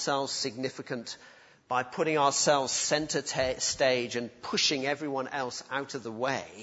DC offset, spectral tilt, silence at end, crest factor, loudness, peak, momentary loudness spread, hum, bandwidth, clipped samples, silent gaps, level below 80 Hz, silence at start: under 0.1%; -2.5 dB/octave; 0 s; 20 dB; -29 LUFS; -10 dBFS; 11 LU; none; 8.2 kHz; under 0.1%; none; -62 dBFS; 0 s